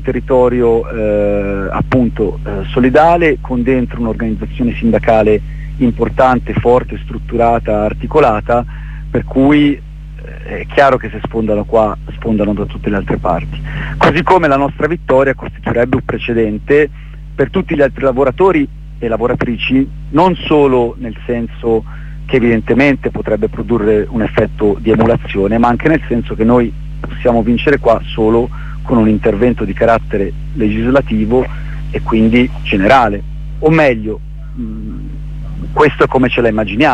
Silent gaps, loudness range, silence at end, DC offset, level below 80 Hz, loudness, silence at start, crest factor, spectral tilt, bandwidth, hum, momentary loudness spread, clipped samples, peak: none; 2 LU; 0 s; under 0.1%; -26 dBFS; -13 LUFS; 0 s; 12 dB; -8 dB/octave; 9 kHz; none; 13 LU; under 0.1%; 0 dBFS